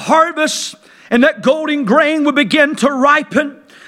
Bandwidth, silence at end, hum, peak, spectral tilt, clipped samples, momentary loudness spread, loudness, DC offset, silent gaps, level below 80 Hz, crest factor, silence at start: 15 kHz; 0.3 s; none; 0 dBFS; -3.5 dB/octave; under 0.1%; 6 LU; -13 LUFS; under 0.1%; none; -58 dBFS; 14 dB; 0 s